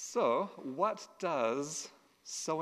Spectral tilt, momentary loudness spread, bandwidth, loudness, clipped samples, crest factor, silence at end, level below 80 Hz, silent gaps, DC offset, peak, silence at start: -3.5 dB/octave; 11 LU; 14.5 kHz; -35 LUFS; under 0.1%; 18 dB; 0 s; -86 dBFS; none; under 0.1%; -18 dBFS; 0 s